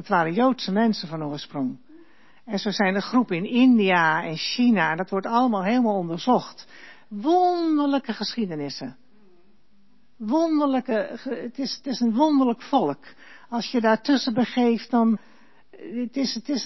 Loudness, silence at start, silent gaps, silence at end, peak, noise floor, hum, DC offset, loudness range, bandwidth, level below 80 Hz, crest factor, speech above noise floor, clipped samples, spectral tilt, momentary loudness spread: -23 LUFS; 0 s; none; 0 s; -8 dBFS; -63 dBFS; none; 0.3%; 6 LU; 6.2 kHz; -74 dBFS; 16 dB; 40 dB; under 0.1%; -5.5 dB/octave; 12 LU